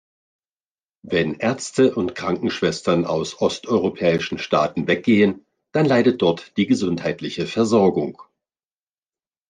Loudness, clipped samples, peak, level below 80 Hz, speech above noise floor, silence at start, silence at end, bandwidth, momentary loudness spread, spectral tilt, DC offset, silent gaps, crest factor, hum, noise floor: -20 LUFS; under 0.1%; -4 dBFS; -62 dBFS; over 70 dB; 1.05 s; 1.3 s; 9.8 kHz; 8 LU; -5.5 dB/octave; under 0.1%; none; 18 dB; none; under -90 dBFS